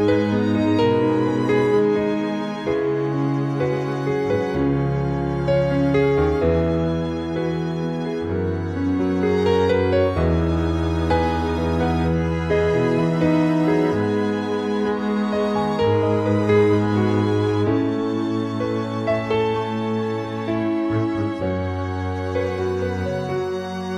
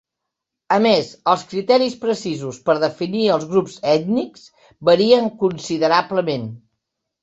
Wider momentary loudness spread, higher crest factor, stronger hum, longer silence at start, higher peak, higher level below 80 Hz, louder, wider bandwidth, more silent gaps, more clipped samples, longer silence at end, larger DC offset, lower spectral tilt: about the same, 6 LU vs 8 LU; about the same, 14 dB vs 18 dB; neither; second, 0 s vs 0.7 s; second, -6 dBFS vs -2 dBFS; first, -38 dBFS vs -62 dBFS; second, -21 LUFS vs -18 LUFS; first, 10.5 kHz vs 8 kHz; neither; neither; second, 0 s vs 0.65 s; first, 0.1% vs under 0.1%; first, -8 dB/octave vs -5.5 dB/octave